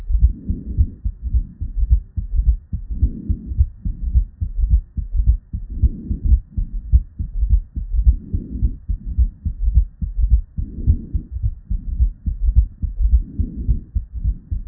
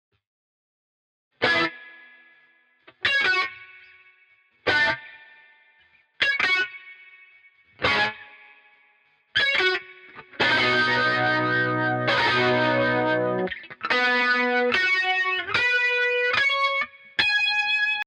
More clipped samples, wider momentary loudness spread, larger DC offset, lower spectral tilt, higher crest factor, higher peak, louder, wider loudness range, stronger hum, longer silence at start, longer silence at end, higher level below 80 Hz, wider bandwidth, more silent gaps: neither; about the same, 8 LU vs 9 LU; neither; first, -15 dB/octave vs -4 dB/octave; about the same, 18 dB vs 16 dB; first, 0 dBFS vs -8 dBFS; about the same, -23 LUFS vs -22 LUFS; second, 1 LU vs 6 LU; neither; second, 0 s vs 1.4 s; about the same, 0.05 s vs 0.05 s; first, -20 dBFS vs -60 dBFS; second, 0.7 kHz vs 11 kHz; neither